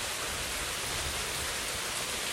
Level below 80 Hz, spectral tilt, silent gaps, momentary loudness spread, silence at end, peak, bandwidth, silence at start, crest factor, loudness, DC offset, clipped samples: -48 dBFS; -1 dB/octave; none; 1 LU; 0 s; -20 dBFS; 16 kHz; 0 s; 14 dB; -32 LUFS; under 0.1%; under 0.1%